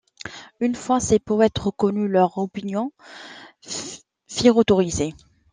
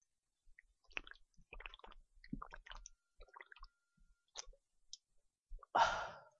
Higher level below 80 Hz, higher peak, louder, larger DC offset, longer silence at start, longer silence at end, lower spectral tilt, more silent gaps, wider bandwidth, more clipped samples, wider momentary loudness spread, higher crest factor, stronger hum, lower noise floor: first, -50 dBFS vs -62 dBFS; first, -2 dBFS vs -20 dBFS; first, -21 LUFS vs -43 LUFS; neither; second, 0.25 s vs 0.45 s; first, 0.4 s vs 0.15 s; first, -5 dB/octave vs -2.5 dB/octave; second, none vs 5.39-5.43 s; first, 10 kHz vs 8 kHz; neither; second, 21 LU vs 27 LU; second, 20 dB vs 28 dB; neither; second, -39 dBFS vs -78 dBFS